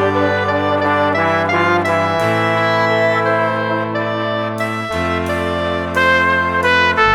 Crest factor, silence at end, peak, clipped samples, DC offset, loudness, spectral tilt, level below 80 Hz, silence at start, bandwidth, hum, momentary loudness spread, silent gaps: 14 dB; 0 s; 0 dBFS; under 0.1%; under 0.1%; -15 LUFS; -5.5 dB/octave; -44 dBFS; 0 s; 15.5 kHz; none; 7 LU; none